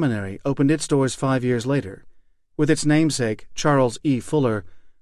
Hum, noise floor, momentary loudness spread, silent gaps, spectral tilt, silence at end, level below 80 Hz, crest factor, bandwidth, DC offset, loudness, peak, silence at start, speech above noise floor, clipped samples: none; -50 dBFS; 7 LU; none; -6 dB/octave; 0.1 s; -52 dBFS; 16 dB; 13 kHz; under 0.1%; -21 LUFS; -6 dBFS; 0 s; 29 dB; under 0.1%